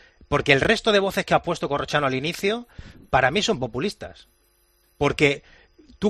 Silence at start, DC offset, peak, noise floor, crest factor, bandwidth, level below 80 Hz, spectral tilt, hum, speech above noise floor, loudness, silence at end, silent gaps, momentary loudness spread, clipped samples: 0.3 s; under 0.1%; 0 dBFS; -63 dBFS; 22 dB; 14 kHz; -48 dBFS; -4.5 dB/octave; none; 41 dB; -22 LUFS; 0 s; none; 11 LU; under 0.1%